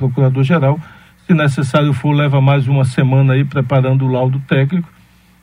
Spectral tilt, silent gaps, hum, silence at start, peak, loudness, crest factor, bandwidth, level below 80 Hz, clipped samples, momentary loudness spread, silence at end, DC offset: -8 dB/octave; none; none; 0 s; 0 dBFS; -14 LUFS; 14 dB; 11 kHz; -52 dBFS; under 0.1%; 4 LU; 0.55 s; under 0.1%